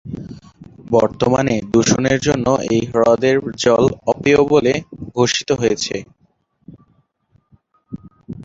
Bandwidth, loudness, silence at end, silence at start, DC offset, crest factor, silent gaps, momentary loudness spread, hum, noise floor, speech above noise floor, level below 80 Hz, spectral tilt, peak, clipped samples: 7.8 kHz; -16 LUFS; 0 s; 0.05 s; under 0.1%; 16 dB; none; 17 LU; none; -61 dBFS; 45 dB; -46 dBFS; -5 dB/octave; 0 dBFS; under 0.1%